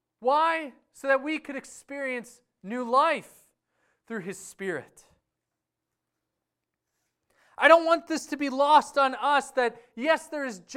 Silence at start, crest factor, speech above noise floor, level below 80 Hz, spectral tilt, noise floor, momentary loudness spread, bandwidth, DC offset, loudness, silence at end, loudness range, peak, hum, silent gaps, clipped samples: 0.2 s; 24 dB; 60 dB; -74 dBFS; -3 dB/octave; -86 dBFS; 17 LU; 15 kHz; under 0.1%; -25 LUFS; 0 s; 17 LU; -4 dBFS; none; none; under 0.1%